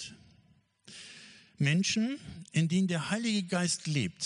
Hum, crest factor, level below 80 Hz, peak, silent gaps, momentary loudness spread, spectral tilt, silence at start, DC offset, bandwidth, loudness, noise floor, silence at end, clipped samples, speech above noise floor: none; 18 dB; -68 dBFS; -14 dBFS; none; 20 LU; -4.5 dB/octave; 0 s; under 0.1%; 10.5 kHz; -30 LUFS; -66 dBFS; 0 s; under 0.1%; 36 dB